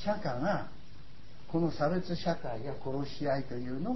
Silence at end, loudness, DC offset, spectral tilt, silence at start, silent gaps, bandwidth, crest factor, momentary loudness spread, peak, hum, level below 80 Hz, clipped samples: 0 s; -34 LUFS; 1%; -7.5 dB/octave; 0 s; none; 6 kHz; 16 dB; 20 LU; -18 dBFS; none; -56 dBFS; under 0.1%